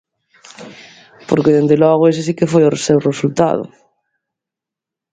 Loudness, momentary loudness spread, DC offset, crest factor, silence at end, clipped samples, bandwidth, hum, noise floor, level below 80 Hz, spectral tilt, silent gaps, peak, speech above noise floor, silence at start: -14 LUFS; 22 LU; under 0.1%; 16 dB; 1.45 s; under 0.1%; 9.4 kHz; none; -85 dBFS; -54 dBFS; -6.5 dB/octave; none; 0 dBFS; 72 dB; 0.6 s